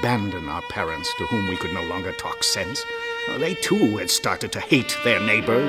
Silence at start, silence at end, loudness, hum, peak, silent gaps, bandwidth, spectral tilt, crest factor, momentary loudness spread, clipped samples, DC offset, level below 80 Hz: 0 s; 0 s; -23 LUFS; none; -2 dBFS; none; 16 kHz; -3.5 dB/octave; 22 dB; 9 LU; under 0.1%; under 0.1%; -48 dBFS